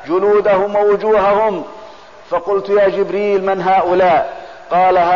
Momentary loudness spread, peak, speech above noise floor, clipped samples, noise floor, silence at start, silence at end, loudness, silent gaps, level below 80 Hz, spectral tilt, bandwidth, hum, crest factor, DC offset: 10 LU; -4 dBFS; 24 dB; under 0.1%; -37 dBFS; 0 s; 0 s; -14 LUFS; none; -48 dBFS; -7 dB/octave; 7.2 kHz; none; 10 dB; 0.6%